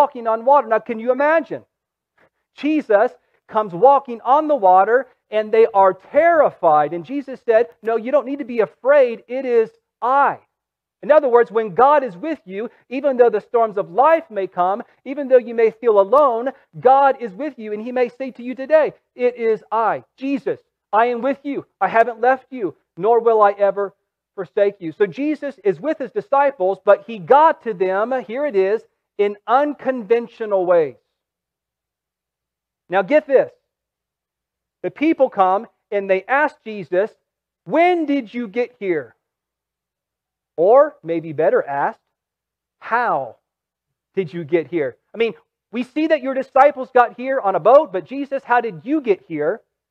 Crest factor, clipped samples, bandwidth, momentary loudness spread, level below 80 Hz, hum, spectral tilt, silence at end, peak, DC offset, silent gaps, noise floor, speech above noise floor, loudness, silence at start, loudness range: 18 dB; under 0.1%; 6.6 kHz; 13 LU; -72 dBFS; none; -7.5 dB/octave; 0.35 s; 0 dBFS; under 0.1%; none; -85 dBFS; 68 dB; -18 LUFS; 0 s; 6 LU